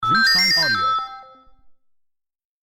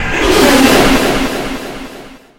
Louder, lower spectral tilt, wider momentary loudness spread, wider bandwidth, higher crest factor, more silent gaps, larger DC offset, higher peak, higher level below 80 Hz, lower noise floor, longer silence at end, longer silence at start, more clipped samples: second, -16 LUFS vs -10 LUFS; second, -1.5 dB/octave vs -3.5 dB/octave; second, 11 LU vs 19 LU; about the same, 17 kHz vs 17.5 kHz; about the same, 14 dB vs 12 dB; neither; neither; second, -8 dBFS vs 0 dBFS; second, -52 dBFS vs -26 dBFS; first, -73 dBFS vs -33 dBFS; first, 1.4 s vs 0.25 s; about the same, 0 s vs 0 s; second, under 0.1% vs 0.1%